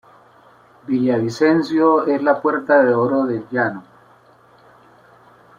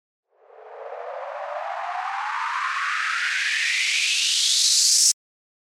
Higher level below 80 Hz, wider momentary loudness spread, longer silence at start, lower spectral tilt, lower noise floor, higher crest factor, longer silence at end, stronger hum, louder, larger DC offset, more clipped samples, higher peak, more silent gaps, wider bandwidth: first, -64 dBFS vs under -90 dBFS; second, 8 LU vs 18 LU; first, 0.9 s vs 0.55 s; first, -7 dB/octave vs 8.5 dB/octave; first, -51 dBFS vs -47 dBFS; about the same, 18 dB vs 20 dB; first, 1.8 s vs 0.6 s; neither; first, -17 LUFS vs -20 LUFS; neither; neither; about the same, -2 dBFS vs -4 dBFS; neither; second, 7.6 kHz vs 17 kHz